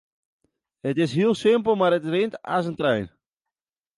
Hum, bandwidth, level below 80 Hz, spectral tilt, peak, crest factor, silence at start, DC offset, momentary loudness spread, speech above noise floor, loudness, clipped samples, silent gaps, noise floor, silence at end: none; 11.5 kHz; -62 dBFS; -6.5 dB/octave; -8 dBFS; 16 dB; 0.85 s; under 0.1%; 8 LU; over 68 dB; -23 LUFS; under 0.1%; none; under -90 dBFS; 0.9 s